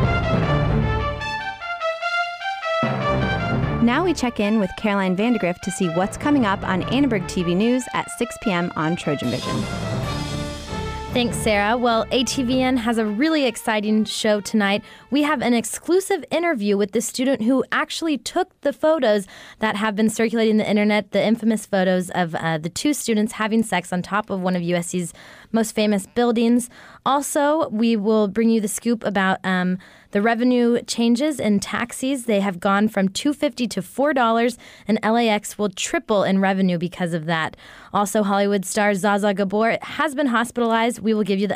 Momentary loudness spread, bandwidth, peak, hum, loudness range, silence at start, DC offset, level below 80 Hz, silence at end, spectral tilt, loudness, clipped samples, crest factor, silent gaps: 7 LU; 15.5 kHz; -8 dBFS; none; 2 LU; 0 s; under 0.1%; -42 dBFS; 0 s; -5 dB/octave; -21 LUFS; under 0.1%; 12 dB; none